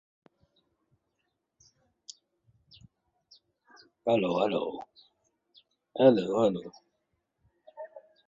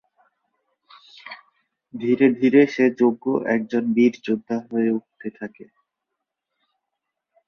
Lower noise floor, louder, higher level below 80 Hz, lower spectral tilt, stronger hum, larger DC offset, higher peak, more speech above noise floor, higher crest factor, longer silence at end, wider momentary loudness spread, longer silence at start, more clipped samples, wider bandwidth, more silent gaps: about the same, -81 dBFS vs -82 dBFS; second, -27 LUFS vs -20 LUFS; second, -74 dBFS vs -68 dBFS; about the same, -6.5 dB/octave vs -7.5 dB/octave; neither; neither; second, -8 dBFS vs -2 dBFS; second, 55 dB vs 62 dB; first, 26 dB vs 20 dB; second, 0.3 s vs 1.85 s; first, 26 LU vs 23 LU; first, 4.05 s vs 1.25 s; neither; first, 7.6 kHz vs 6.6 kHz; neither